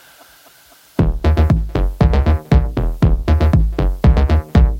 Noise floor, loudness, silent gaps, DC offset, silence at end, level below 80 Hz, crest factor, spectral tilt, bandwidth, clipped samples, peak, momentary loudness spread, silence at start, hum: -47 dBFS; -16 LUFS; none; under 0.1%; 0 s; -16 dBFS; 14 dB; -8.5 dB/octave; 7 kHz; under 0.1%; 0 dBFS; 5 LU; 1 s; none